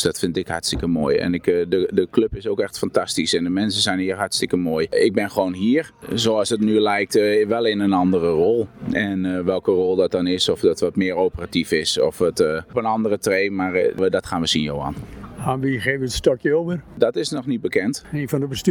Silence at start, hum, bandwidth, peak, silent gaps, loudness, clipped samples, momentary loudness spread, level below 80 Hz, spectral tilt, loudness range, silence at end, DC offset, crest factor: 0 s; none; 19 kHz; -4 dBFS; none; -20 LUFS; under 0.1%; 6 LU; -46 dBFS; -4.5 dB/octave; 3 LU; 0 s; under 0.1%; 18 dB